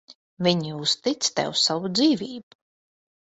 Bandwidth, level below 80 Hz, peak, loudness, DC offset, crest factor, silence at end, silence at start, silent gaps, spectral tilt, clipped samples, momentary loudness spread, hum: 8.4 kHz; -66 dBFS; -6 dBFS; -23 LUFS; under 0.1%; 20 dB; 0.95 s; 0.1 s; 0.15-0.37 s; -3.5 dB/octave; under 0.1%; 6 LU; none